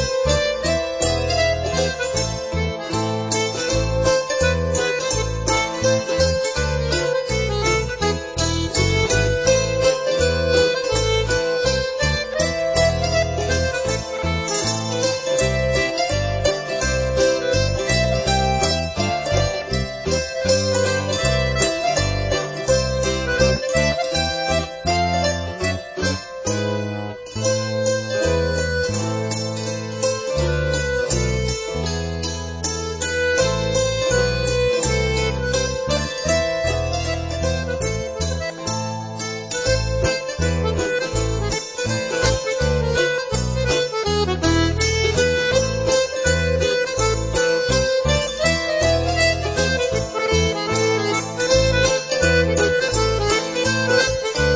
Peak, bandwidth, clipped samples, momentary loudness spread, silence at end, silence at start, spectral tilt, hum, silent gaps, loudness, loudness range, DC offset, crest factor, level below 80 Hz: -4 dBFS; 8 kHz; under 0.1%; 6 LU; 0 s; 0 s; -4 dB/octave; none; none; -20 LUFS; 4 LU; under 0.1%; 16 dB; -30 dBFS